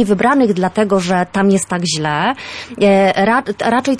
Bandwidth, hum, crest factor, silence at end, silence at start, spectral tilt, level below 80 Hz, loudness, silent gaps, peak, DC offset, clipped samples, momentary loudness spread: 11 kHz; none; 12 dB; 0 s; 0 s; -5 dB/octave; -50 dBFS; -14 LUFS; none; -2 dBFS; under 0.1%; under 0.1%; 6 LU